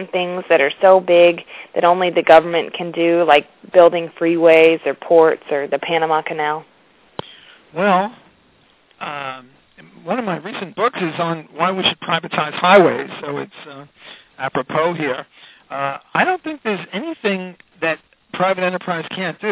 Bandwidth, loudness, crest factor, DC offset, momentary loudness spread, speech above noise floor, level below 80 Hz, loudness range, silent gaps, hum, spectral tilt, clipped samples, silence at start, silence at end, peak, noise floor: 4 kHz; -17 LUFS; 18 dB; under 0.1%; 16 LU; 38 dB; -64 dBFS; 10 LU; none; none; -9 dB/octave; under 0.1%; 0 s; 0 s; 0 dBFS; -55 dBFS